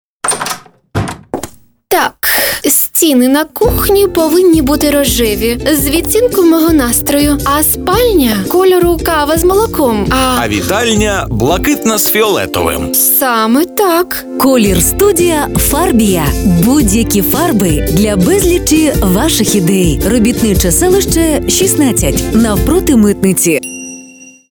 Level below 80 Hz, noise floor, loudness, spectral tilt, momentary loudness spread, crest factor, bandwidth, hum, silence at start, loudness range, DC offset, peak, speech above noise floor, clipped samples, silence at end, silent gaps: -24 dBFS; -35 dBFS; -10 LUFS; -4 dB/octave; 5 LU; 10 dB; over 20 kHz; none; 0.25 s; 1 LU; under 0.1%; 0 dBFS; 26 dB; under 0.1%; 0.25 s; none